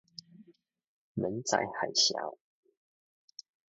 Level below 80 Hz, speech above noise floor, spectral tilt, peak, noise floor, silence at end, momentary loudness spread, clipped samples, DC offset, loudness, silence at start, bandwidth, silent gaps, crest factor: -74 dBFS; 30 dB; -1.5 dB/octave; -12 dBFS; -62 dBFS; 1.35 s; 25 LU; under 0.1%; under 0.1%; -31 LUFS; 0.4 s; 7.6 kHz; 0.84-1.15 s; 24 dB